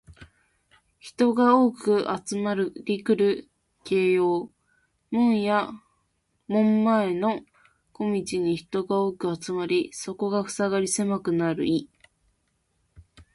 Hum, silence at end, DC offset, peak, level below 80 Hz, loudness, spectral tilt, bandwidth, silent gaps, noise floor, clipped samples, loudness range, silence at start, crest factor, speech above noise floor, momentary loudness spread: none; 0.15 s; under 0.1%; -6 dBFS; -64 dBFS; -25 LUFS; -5.5 dB/octave; 11.5 kHz; none; -72 dBFS; under 0.1%; 4 LU; 0.1 s; 20 dB; 49 dB; 10 LU